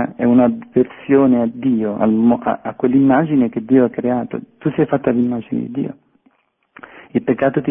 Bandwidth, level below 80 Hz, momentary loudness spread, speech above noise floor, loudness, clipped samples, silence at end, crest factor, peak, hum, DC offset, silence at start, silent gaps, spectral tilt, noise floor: 3.6 kHz; -54 dBFS; 10 LU; 43 dB; -16 LUFS; under 0.1%; 0 s; 16 dB; -2 dBFS; none; under 0.1%; 0 s; none; -12.5 dB/octave; -59 dBFS